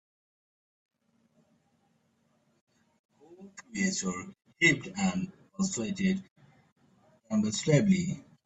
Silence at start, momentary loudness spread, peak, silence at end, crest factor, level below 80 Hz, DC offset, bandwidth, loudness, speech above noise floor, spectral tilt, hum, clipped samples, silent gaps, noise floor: 3.3 s; 16 LU; -12 dBFS; 0.25 s; 22 dB; -66 dBFS; under 0.1%; 8.4 kHz; -29 LUFS; 43 dB; -4.5 dB/octave; none; under 0.1%; 6.31-6.36 s, 6.72-6.76 s; -72 dBFS